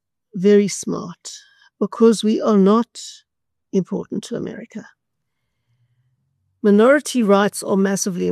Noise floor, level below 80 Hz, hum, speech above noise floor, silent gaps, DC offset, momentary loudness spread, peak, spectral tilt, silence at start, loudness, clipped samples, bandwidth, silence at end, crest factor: -77 dBFS; -68 dBFS; none; 60 dB; none; under 0.1%; 20 LU; -2 dBFS; -5.5 dB/octave; 0.35 s; -18 LUFS; under 0.1%; 13 kHz; 0 s; 18 dB